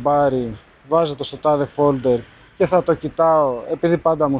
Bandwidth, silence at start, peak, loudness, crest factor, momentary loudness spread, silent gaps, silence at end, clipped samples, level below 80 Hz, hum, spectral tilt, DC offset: 4.9 kHz; 0 s; -2 dBFS; -19 LUFS; 16 dB; 7 LU; none; 0 s; under 0.1%; -48 dBFS; none; -11.5 dB/octave; under 0.1%